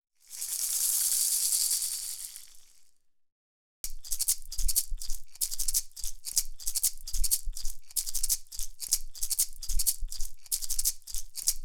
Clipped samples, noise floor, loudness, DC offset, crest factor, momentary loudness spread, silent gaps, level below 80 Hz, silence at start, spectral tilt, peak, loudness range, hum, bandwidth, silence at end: under 0.1%; -61 dBFS; -29 LUFS; under 0.1%; 24 dB; 16 LU; 3.32-3.84 s; -38 dBFS; 0.3 s; 2 dB/octave; -6 dBFS; 5 LU; none; over 20 kHz; 0 s